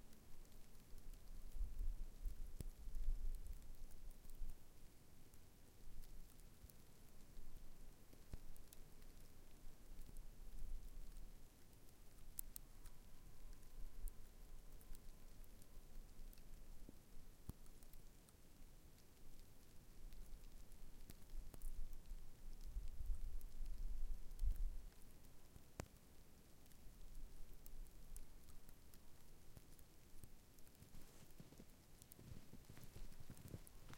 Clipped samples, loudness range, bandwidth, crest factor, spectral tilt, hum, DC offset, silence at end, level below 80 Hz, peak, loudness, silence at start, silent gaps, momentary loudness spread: under 0.1%; 10 LU; 16.5 kHz; 28 dB; -4.5 dB/octave; none; under 0.1%; 0 s; -52 dBFS; -22 dBFS; -61 LUFS; 0 s; none; 13 LU